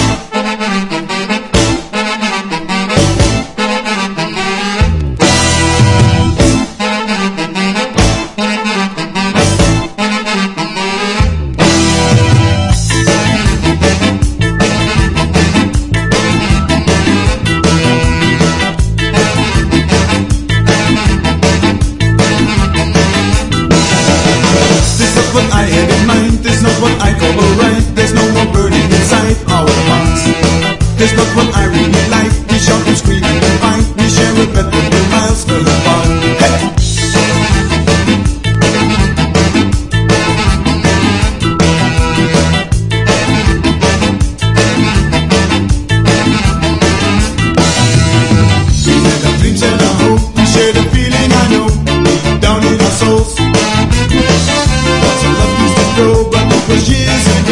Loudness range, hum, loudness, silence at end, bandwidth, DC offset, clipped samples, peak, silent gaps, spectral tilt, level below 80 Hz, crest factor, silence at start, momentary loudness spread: 3 LU; none; -10 LUFS; 0 s; 11.5 kHz; under 0.1%; 0.3%; 0 dBFS; none; -5 dB/octave; -20 dBFS; 10 dB; 0 s; 5 LU